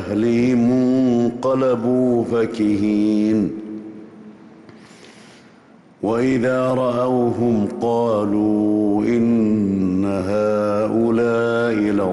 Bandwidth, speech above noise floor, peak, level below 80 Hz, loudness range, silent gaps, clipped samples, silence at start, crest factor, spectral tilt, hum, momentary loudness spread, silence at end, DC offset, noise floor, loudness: 11.5 kHz; 31 dB; -10 dBFS; -54 dBFS; 6 LU; none; under 0.1%; 0 s; 8 dB; -8 dB/octave; none; 4 LU; 0 s; under 0.1%; -48 dBFS; -18 LUFS